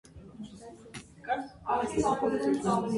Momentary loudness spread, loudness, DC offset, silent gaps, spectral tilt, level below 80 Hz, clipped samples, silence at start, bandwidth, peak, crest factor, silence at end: 18 LU; -30 LUFS; under 0.1%; none; -5.5 dB/octave; -56 dBFS; under 0.1%; 0.15 s; 11.5 kHz; -16 dBFS; 16 dB; 0 s